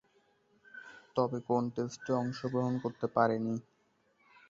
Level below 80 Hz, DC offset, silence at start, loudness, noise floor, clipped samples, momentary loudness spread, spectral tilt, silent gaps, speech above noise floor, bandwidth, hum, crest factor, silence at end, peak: -74 dBFS; under 0.1%; 0.75 s; -34 LUFS; -72 dBFS; under 0.1%; 19 LU; -7 dB/octave; none; 40 dB; 7.6 kHz; none; 22 dB; 0.9 s; -14 dBFS